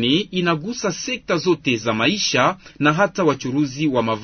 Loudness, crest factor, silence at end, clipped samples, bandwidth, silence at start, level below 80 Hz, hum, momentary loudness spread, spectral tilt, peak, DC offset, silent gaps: -20 LUFS; 16 dB; 0 s; under 0.1%; 6.6 kHz; 0 s; -54 dBFS; none; 5 LU; -4.5 dB/octave; -4 dBFS; under 0.1%; none